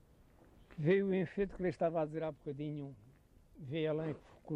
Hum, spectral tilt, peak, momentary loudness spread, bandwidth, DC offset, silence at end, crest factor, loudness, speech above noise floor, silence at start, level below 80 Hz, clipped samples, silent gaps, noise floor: none; -9 dB/octave; -20 dBFS; 16 LU; 8.4 kHz; under 0.1%; 0 s; 18 dB; -37 LUFS; 27 dB; 0.7 s; -64 dBFS; under 0.1%; none; -64 dBFS